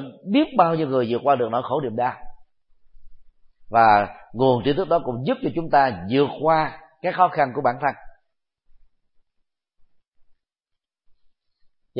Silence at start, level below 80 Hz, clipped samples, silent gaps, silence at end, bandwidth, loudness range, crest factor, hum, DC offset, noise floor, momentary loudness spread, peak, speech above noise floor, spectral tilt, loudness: 0 s; -52 dBFS; under 0.1%; none; 3.9 s; 5.2 kHz; 6 LU; 22 dB; none; under 0.1%; -81 dBFS; 8 LU; -2 dBFS; 61 dB; -11 dB/octave; -21 LUFS